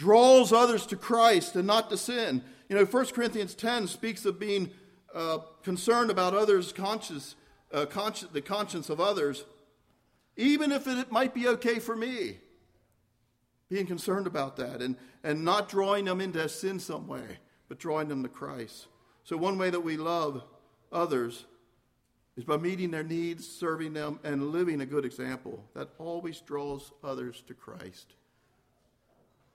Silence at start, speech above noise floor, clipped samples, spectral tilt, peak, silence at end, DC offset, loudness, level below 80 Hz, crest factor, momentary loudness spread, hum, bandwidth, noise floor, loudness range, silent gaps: 0 s; 44 dB; under 0.1%; -4.5 dB/octave; -8 dBFS; 1.55 s; under 0.1%; -29 LUFS; -70 dBFS; 22 dB; 16 LU; none; 16 kHz; -73 dBFS; 7 LU; none